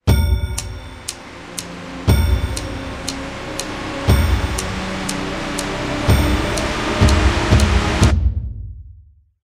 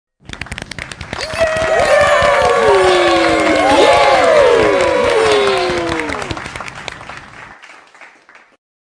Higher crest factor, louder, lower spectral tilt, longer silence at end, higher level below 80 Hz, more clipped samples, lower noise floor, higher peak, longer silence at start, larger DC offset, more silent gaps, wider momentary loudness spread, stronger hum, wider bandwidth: about the same, 18 dB vs 14 dB; second, -19 LUFS vs -12 LUFS; first, -5 dB/octave vs -3.5 dB/octave; second, 0.5 s vs 0.75 s; first, -22 dBFS vs -38 dBFS; neither; about the same, -47 dBFS vs -45 dBFS; about the same, 0 dBFS vs 0 dBFS; second, 0.05 s vs 0.3 s; first, 0.2% vs under 0.1%; neither; second, 14 LU vs 17 LU; neither; first, 14.5 kHz vs 10.5 kHz